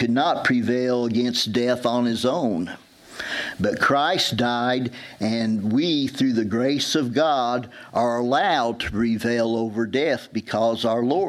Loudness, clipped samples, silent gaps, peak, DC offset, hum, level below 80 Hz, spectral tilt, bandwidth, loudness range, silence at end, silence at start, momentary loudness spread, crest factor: -22 LUFS; under 0.1%; none; -6 dBFS; under 0.1%; none; -54 dBFS; -5 dB/octave; 14.5 kHz; 1 LU; 0 s; 0 s; 8 LU; 16 dB